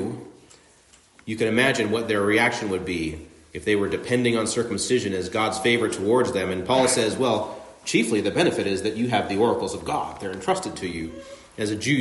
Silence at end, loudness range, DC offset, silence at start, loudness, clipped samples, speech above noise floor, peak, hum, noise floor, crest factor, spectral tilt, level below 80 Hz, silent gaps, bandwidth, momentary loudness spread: 0 s; 2 LU; under 0.1%; 0 s; -23 LUFS; under 0.1%; 32 dB; -6 dBFS; none; -55 dBFS; 18 dB; -4 dB/octave; -56 dBFS; none; 11.5 kHz; 12 LU